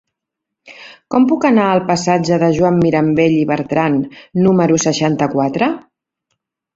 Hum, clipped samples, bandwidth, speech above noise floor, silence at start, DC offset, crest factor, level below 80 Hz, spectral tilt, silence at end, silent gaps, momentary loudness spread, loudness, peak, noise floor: none; under 0.1%; 7.8 kHz; 66 dB; 0.65 s; under 0.1%; 14 dB; -50 dBFS; -6 dB/octave; 0.95 s; none; 6 LU; -14 LUFS; -2 dBFS; -80 dBFS